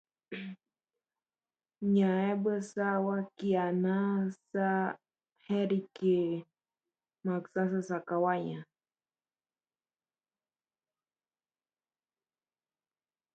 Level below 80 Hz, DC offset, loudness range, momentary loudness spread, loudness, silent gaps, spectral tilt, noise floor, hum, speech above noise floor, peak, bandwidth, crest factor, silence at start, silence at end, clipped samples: -80 dBFS; under 0.1%; 6 LU; 12 LU; -32 LUFS; 5.32-5.36 s; -8 dB/octave; under -90 dBFS; none; over 59 dB; -16 dBFS; 8.2 kHz; 18 dB; 0.3 s; 4.7 s; under 0.1%